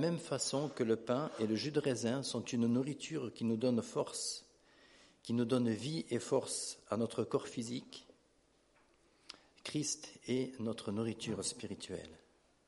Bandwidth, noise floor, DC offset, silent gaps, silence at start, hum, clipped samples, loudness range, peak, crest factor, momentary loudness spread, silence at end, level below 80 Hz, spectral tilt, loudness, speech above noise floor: 11.5 kHz; -72 dBFS; under 0.1%; none; 0 s; none; under 0.1%; 6 LU; -20 dBFS; 18 dB; 12 LU; 0.5 s; -76 dBFS; -4.5 dB/octave; -38 LUFS; 35 dB